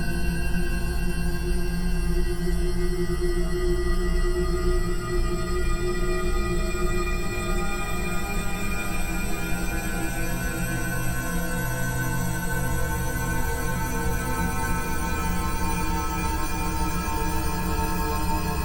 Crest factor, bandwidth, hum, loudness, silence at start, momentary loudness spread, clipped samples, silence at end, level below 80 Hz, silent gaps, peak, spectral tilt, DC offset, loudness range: 12 dB; 18.5 kHz; none; -28 LUFS; 0 s; 2 LU; under 0.1%; 0 s; -28 dBFS; none; -12 dBFS; -5 dB/octave; under 0.1%; 1 LU